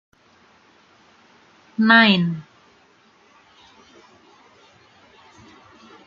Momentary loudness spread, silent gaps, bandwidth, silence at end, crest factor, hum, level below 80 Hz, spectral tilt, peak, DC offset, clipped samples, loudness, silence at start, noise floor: 21 LU; none; 7.2 kHz; 3.65 s; 24 dB; none; -70 dBFS; -6.5 dB/octave; -2 dBFS; under 0.1%; under 0.1%; -15 LUFS; 1.8 s; -56 dBFS